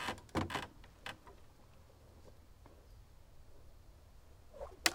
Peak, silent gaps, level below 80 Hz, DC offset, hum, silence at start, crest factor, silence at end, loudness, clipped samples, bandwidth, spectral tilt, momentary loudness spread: -8 dBFS; none; -62 dBFS; under 0.1%; none; 0 s; 38 dB; 0 s; -43 LUFS; under 0.1%; 16.5 kHz; -2.5 dB/octave; 23 LU